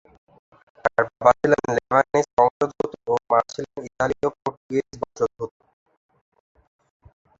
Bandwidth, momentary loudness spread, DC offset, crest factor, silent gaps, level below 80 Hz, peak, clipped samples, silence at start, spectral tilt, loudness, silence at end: 7.8 kHz; 13 LU; under 0.1%; 22 dB; 2.33-2.37 s, 2.51-2.60 s, 4.57-4.69 s; -56 dBFS; -2 dBFS; under 0.1%; 0.85 s; -5.5 dB/octave; -22 LUFS; 1.9 s